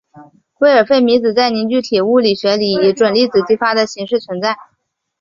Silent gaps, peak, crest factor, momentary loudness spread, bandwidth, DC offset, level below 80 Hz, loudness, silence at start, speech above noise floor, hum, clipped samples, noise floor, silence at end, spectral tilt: none; -2 dBFS; 12 dB; 8 LU; 7.6 kHz; under 0.1%; -56 dBFS; -14 LUFS; 0.15 s; 55 dB; none; under 0.1%; -68 dBFS; 0.65 s; -5 dB/octave